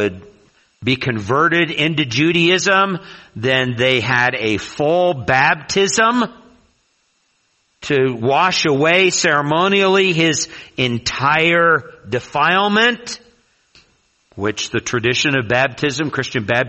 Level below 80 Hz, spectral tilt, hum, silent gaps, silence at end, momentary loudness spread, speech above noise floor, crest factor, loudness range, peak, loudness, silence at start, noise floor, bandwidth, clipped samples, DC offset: -52 dBFS; -4 dB/octave; none; none; 0 s; 10 LU; 47 dB; 16 dB; 4 LU; 0 dBFS; -16 LUFS; 0 s; -63 dBFS; 8.4 kHz; under 0.1%; under 0.1%